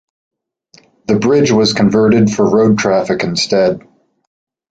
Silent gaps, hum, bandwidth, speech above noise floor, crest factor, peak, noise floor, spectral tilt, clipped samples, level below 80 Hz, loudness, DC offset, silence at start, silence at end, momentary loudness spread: none; none; 9 kHz; 38 dB; 12 dB; 0 dBFS; -49 dBFS; -5.5 dB/octave; under 0.1%; -48 dBFS; -12 LUFS; under 0.1%; 1.1 s; 0.9 s; 6 LU